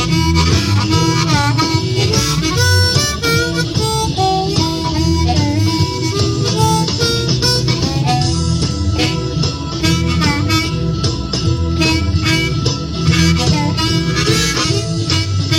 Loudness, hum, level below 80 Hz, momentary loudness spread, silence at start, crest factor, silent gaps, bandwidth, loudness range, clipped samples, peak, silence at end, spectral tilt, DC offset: -14 LUFS; none; -28 dBFS; 4 LU; 0 s; 14 dB; none; 17 kHz; 2 LU; under 0.1%; 0 dBFS; 0 s; -4.5 dB/octave; 0.1%